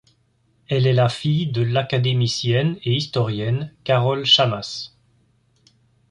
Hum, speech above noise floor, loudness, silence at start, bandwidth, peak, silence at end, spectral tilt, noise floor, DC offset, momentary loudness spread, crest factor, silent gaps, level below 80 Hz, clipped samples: none; 43 dB; -20 LUFS; 0.7 s; 10 kHz; -4 dBFS; 1.25 s; -5.5 dB/octave; -63 dBFS; under 0.1%; 10 LU; 18 dB; none; -54 dBFS; under 0.1%